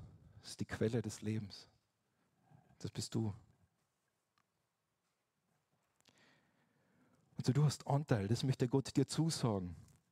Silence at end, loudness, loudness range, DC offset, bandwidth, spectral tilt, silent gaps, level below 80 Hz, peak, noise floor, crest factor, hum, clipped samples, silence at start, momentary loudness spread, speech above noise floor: 0.3 s; -38 LUFS; 12 LU; under 0.1%; 14 kHz; -6 dB/octave; none; -72 dBFS; -18 dBFS; -86 dBFS; 24 dB; none; under 0.1%; 0 s; 17 LU; 49 dB